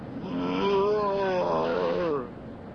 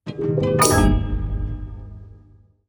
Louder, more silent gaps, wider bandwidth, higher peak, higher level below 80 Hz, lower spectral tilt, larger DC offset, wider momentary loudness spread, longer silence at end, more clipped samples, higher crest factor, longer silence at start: second, -27 LUFS vs -20 LUFS; neither; second, 6.6 kHz vs over 20 kHz; second, -14 dBFS vs -2 dBFS; second, -54 dBFS vs -28 dBFS; first, -7 dB/octave vs -5 dB/octave; neither; second, 9 LU vs 21 LU; second, 0 s vs 0.5 s; neither; second, 12 dB vs 18 dB; about the same, 0 s vs 0.05 s